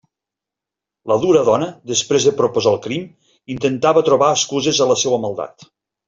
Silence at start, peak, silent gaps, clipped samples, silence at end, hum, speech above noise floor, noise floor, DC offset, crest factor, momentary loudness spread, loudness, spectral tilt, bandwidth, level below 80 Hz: 1.05 s; -2 dBFS; none; under 0.1%; 0.45 s; none; 69 dB; -85 dBFS; under 0.1%; 16 dB; 13 LU; -16 LUFS; -3.5 dB/octave; 7.8 kHz; -58 dBFS